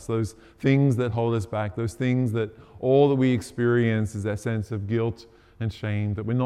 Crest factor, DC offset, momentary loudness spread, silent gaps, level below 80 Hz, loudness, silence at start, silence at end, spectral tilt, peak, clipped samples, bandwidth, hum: 16 dB; under 0.1%; 10 LU; none; -56 dBFS; -25 LUFS; 0 s; 0 s; -8 dB/octave; -8 dBFS; under 0.1%; 12.5 kHz; none